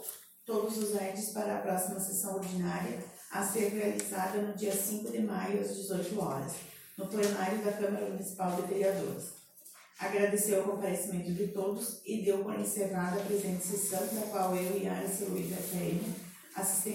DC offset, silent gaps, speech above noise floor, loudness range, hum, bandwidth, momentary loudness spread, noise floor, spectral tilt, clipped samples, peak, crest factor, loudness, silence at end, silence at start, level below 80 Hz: under 0.1%; none; 23 dB; 2 LU; none; 16.5 kHz; 9 LU; -56 dBFS; -4.5 dB/octave; under 0.1%; -14 dBFS; 20 dB; -34 LUFS; 0 s; 0 s; -72 dBFS